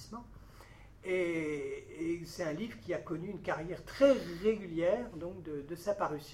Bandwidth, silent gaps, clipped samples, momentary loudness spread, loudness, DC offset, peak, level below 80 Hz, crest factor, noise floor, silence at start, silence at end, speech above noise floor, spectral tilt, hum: 15 kHz; none; under 0.1%; 15 LU; -35 LUFS; under 0.1%; -14 dBFS; -60 dBFS; 22 dB; -55 dBFS; 0 s; 0 s; 20 dB; -6 dB/octave; none